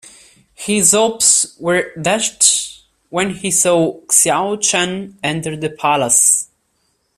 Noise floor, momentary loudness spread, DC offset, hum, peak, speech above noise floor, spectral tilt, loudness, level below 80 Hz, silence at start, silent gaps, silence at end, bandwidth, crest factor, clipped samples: -64 dBFS; 11 LU; under 0.1%; none; 0 dBFS; 49 dB; -2 dB/octave; -14 LUFS; -56 dBFS; 0.6 s; none; 0.75 s; 16 kHz; 16 dB; under 0.1%